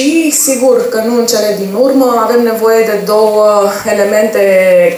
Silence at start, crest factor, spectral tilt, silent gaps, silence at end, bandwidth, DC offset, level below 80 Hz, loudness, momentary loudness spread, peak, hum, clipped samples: 0 s; 8 dB; -3.5 dB/octave; none; 0 s; over 20 kHz; under 0.1%; -56 dBFS; -9 LUFS; 4 LU; 0 dBFS; none; under 0.1%